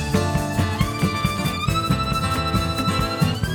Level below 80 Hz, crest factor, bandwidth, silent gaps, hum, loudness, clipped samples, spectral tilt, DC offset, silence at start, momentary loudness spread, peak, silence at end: -34 dBFS; 16 dB; over 20 kHz; none; none; -22 LUFS; under 0.1%; -5.5 dB/octave; under 0.1%; 0 s; 2 LU; -6 dBFS; 0 s